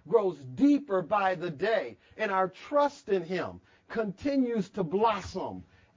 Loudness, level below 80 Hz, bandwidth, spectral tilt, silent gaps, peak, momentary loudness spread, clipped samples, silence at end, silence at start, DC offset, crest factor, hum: -29 LUFS; -62 dBFS; 7.6 kHz; -6.5 dB/octave; none; -10 dBFS; 11 LU; under 0.1%; 0.35 s; 0.05 s; under 0.1%; 18 dB; none